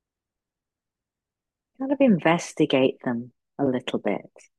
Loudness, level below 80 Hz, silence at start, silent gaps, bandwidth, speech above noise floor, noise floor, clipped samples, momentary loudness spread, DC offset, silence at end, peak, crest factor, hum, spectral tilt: -24 LUFS; -72 dBFS; 1.8 s; none; 11.5 kHz; 65 dB; -88 dBFS; under 0.1%; 13 LU; under 0.1%; 0.35 s; -6 dBFS; 20 dB; none; -6 dB/octave